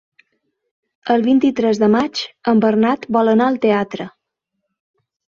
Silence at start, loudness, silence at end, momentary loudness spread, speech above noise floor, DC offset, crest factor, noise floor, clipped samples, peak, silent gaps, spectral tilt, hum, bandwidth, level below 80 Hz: 1.05 s; -16 LUFS; 1.3 s; 11 LU; 61 dB; under 0.1%; 18 dB; -76 dBFS; under 0.1%; 0 dBFS; none; -6.5 dB/octave; none; 7.2 kHz; -60 dBFS